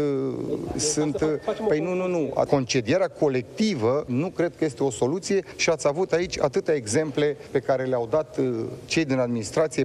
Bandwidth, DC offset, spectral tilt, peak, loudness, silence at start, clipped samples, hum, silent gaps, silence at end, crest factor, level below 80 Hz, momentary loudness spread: 12.5 kHz; under 0.1%; -5 dB/octave; -4 dBFS; -25 LUFS; 0 s; under 0.1%; none; none; 0 s; 20 dB; -54 dBFS; 4 LU